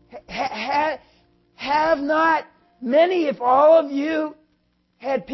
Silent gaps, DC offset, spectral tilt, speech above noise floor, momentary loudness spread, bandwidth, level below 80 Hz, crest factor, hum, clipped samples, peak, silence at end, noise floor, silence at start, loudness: none; under 0.1%; -5 dB/octave; 48 dB; 17 LU; 6 kHz; -58 dBFS; 16 dB; none; under 0.1%; -6 dBFS; 0 s; -66 dBFS; 0.15 s; -20 LUFS